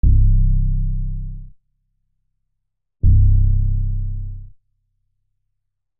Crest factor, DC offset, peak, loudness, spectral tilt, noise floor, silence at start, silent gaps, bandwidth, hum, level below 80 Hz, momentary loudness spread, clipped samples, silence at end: 12 dB; under 0.1%; -4 dBFS; -20 LUFS; -21 dB/octave; -77 dBFS; 0.05 s; none; 0.5 kHz; none; -20 dBFS; 19 LU; under 0.1%; 1.55 s